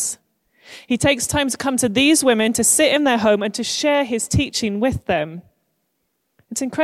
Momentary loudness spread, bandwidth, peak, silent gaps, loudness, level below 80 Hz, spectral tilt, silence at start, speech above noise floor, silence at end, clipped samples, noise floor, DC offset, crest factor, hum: 11 LU; 15.5 kHz; -2 dBFS; none; -18 LUFS; -44 dBFS; -3 dB/octave; 0 s; 53 dB; 0 s; under 0.1%; -72 dBFS; under 0.1%; 16 dB; none